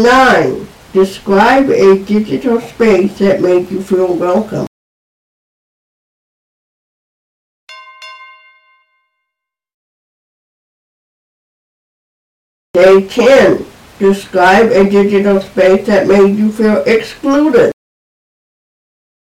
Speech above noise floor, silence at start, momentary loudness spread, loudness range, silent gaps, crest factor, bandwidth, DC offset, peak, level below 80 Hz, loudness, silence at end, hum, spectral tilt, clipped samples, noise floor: 70 dB; 0 s; 8 LU; 9 LU; 4.67-7.67 s, 9.74-12.74 s; 12 dB; 14.5 kHz; under 0.1%; 0 dBFS; -44 dBFS; -10 LUFS; 1.6 s; none; -6 dB/octave; under 0.1%; -79 dBFS